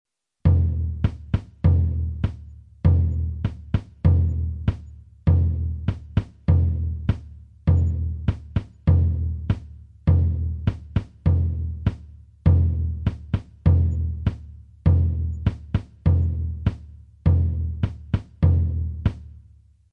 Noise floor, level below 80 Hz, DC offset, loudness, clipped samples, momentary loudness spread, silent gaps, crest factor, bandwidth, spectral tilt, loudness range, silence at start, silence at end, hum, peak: -52 dBFS; -32 dBFS; under 0.1%; -24 LUFS; under 0.1%; 9 LU; none; 16 dB; 3.8 kHz; -10.5 dB/octave; 2 LU; 0.45 s; 0.55 s; none; -6 dBFS